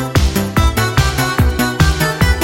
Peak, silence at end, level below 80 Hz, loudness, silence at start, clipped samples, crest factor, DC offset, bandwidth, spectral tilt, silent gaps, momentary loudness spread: 0 dBFS; 0 s; -18 dBFS; -14 LUFS; 0 s; under 0.1%; 12 dB; under 0.1%; 17 kHz; -5 dB/octave; none; 1 LU